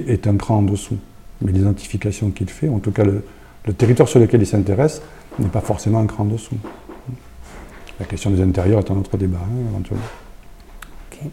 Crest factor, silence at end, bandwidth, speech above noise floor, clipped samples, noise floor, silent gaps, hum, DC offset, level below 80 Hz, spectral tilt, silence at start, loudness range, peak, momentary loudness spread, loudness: 18 dB; 0 s; 13 kHz; 21 dB; under 0.1%; -39 dBFS; none; none; under 0.1%; -40 dBFS; -7.5 dB/octave; 0 s; 5 LU; 0 dBFS; 20 LU; -19 LUFS